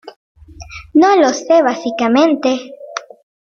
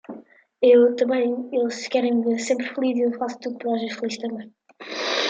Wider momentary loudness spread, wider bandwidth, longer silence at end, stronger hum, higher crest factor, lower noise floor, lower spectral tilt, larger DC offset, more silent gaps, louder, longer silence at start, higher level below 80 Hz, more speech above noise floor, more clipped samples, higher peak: about the same, 18 LU vs 16 LU; second, 7.2 kHz vs 8.8 kHz; first, 0.45 s vs 0 s; neither; about the same, 14 dB vs 16 dB; second, -34 dBFS vs -45 dBFS; about the same, -4 dB/octave vs -3.5 dB/octave; neither; first, 0.16-0.35 s vs none; first, -13 LUFS vs -22 LUFS; about the same, 0.05 s vs 0.1 s; first, -48 dBFS vs -76 dBFS; about the same, 22 dB vs 24 dB; neither; first, 0 dBFS vs -6 dBFS